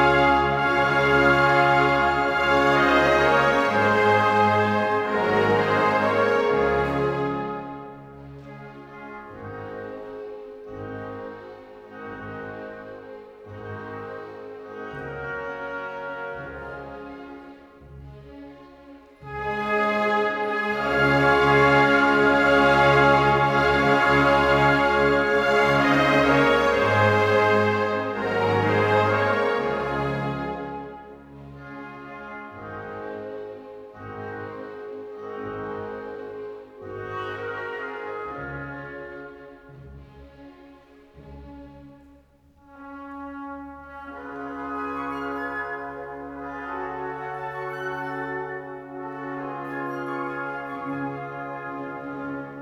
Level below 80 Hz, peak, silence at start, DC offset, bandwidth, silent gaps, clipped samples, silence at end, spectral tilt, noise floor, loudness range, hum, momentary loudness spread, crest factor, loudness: -48 dBFS; -6 dBFS; 0 s; under 0.1%; 14.5 kHz; none; under 0.1%; 0 s; -6 dB/octave; -56 dBFS; 19 LU; none; 22 LU; 18 dB; -22 LUFS